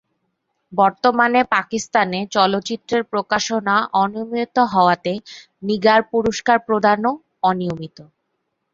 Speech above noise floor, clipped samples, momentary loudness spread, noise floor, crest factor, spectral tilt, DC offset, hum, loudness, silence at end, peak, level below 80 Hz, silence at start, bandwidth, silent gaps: 55 dB; under 0.1%; 9 LU; -73 dBFS; 18 dB; -4.5 dB/octave; under 0.1%; none; -18 LUFS; 0.7 s; -2 dBFS; -58 dBFS; 0.7 s; 7.8 kHz; none